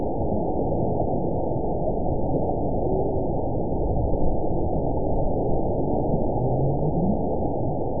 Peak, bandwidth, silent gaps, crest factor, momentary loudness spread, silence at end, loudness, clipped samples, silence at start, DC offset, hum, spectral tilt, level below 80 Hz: -10 dBFS; 1 kHz; none; 14 dB; 3 LU; 0 s; -25 LUFS; under 0.1%; 0 s; 4%; none; -19 dB/octave; -32 dBFS